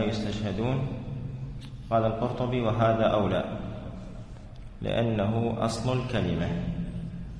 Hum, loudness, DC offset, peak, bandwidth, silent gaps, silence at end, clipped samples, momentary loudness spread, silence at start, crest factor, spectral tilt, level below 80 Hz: none; -29 LUFS; under 0.1%; -12 dBFS; 10.5 kHz; none; 0 s; under 0.1%; 16 LU; 0 s; 18 dB; -7 dB/octave; -44 dBFS